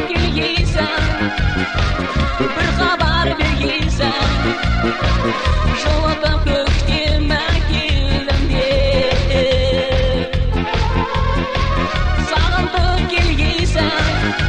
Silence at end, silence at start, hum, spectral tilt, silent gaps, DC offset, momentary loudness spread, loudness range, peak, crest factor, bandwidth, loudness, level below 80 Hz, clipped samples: 0 s; 0 s; none; -5.5 dB/octave; none; under 0.1%; 3 LU; 1 LU; -2 dBFS; 14 dB; 9.6 kHz; -17 LUFS; -20 dBFS; under 0.1%